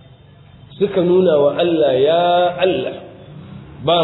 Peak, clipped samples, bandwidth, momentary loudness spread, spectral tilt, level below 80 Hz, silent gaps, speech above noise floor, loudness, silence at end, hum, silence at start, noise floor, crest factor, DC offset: -2 dBFS; under 0.1%; 4.1 kHz; 21 LU; -9.5 dB/octave; -52 dBFS; none; 29 dB; -15 LUFS; 0 s; none; 0.7 s; -44 dBFS; 14 dB; under 0.1%